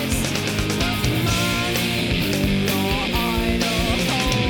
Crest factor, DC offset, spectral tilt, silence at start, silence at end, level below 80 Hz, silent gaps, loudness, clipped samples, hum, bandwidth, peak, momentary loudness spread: 14 dB; under 0.1%; -4 dB/octave; 0 s; 0 s; -30 dBFS; none; -21 LUFS; under 0.1%; none; over 20 kHz; -6 dBFS; 2 LU